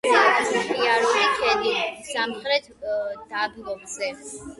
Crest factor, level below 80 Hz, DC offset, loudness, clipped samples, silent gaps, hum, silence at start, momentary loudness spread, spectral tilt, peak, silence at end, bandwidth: 18 dB; -60 dBFS; under 0.1%; -23 LUFS; under 0.1%; none; none; 0.05 s; 11 LU; -1.5 dB/octave; -4 dBFS; 0.05 s; 11.5 kHz